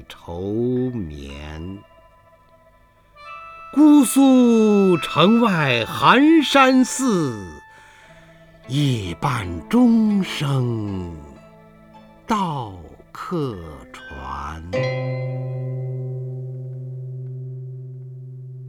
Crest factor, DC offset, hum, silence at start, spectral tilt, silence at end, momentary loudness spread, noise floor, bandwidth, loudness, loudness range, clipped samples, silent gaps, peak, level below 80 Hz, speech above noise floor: 20 dB; under 0.1%; none; 0 s; -5.5 dB/octave; 0 s; 23 LU; -54 dBFS; 19.5 kHz; -18 LUFS; 14 LU; under 0.1%; none; 0 dBFS; -48 dBFS; 35 dB